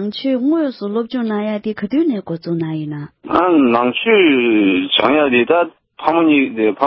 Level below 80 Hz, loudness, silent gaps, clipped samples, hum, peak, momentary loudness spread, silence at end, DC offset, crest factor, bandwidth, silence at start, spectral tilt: -56 dBFS; -15 LUFS; none; under 0.1%; none; 0 dBFS; 10 LU; 0 s; under 0.1%; 16 dB; 5.8 kHz; 0 s; -9 dB/octave